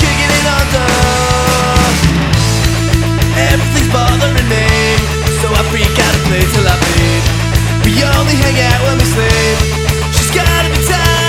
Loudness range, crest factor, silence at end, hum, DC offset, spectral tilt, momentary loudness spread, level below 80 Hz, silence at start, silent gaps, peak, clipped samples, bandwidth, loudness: 1 LU; 10 dB; 0 s; none; under 0.1%; -4.5 dB/octave; 2 LU; -18 dBFS; 0 s; none; 0 dBFS; under 0.1%; 19 kHz; -11 LUFS